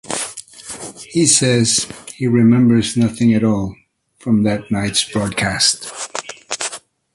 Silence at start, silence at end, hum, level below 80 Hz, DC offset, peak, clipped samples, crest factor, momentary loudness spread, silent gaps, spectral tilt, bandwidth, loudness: 0.05 s; 0.35 s; none; -46 dBFS; under 0.1%; 0 dBFS; under 0.1%; 18 dB; 17 LU; none; -4 dB/octave; 11.5 kHz; -16 LUFS